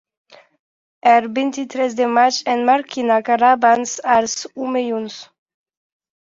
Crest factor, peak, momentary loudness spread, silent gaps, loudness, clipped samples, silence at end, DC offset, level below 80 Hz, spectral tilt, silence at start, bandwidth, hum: 16 dB; -2 dBFS; 9 LU; none; -17 LUFS; under 0.1%; 1 s; under 0.1%; -64 dBFS; -2.5 dB/octave; 1.05 s; 7.8 kHz; none